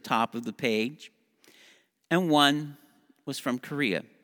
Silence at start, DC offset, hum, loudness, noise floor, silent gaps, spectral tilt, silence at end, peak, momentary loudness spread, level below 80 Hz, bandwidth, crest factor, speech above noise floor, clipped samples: 0.05 s; under 0.1%; none; -27 LUFS; -60 dBFS; none; -4.5 dB/octave; 0.2 s; -6 dBFS; 17 LU; -78 dBFS; over 20 kHz; 24 dB; 33 dB; under 0.1%